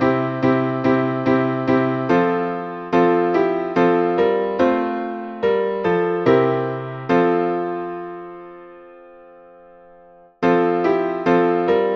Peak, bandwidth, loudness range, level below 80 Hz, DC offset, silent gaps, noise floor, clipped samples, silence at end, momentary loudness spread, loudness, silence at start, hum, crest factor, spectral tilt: -2 dBFS; 6.2 kHz; 6 LU; -58 dBFS; under 0.1%; none; -48 dBFS; under 0.1%; 0 s; 11 LU; -19 LUFS; 0 s; none; 16 dB; -8.5 dB/octave